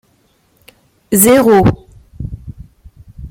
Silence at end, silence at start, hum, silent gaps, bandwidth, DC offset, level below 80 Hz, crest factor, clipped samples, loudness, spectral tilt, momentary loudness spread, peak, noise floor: 0 s; 1.1 s; none; none; 16.5 kHz; under 0.1%; -36 dBFS; 16 dB; under 0.1%; -10 LUFS; -5 dB/octave; 23 LU; 0 dBFS; -56 dBFS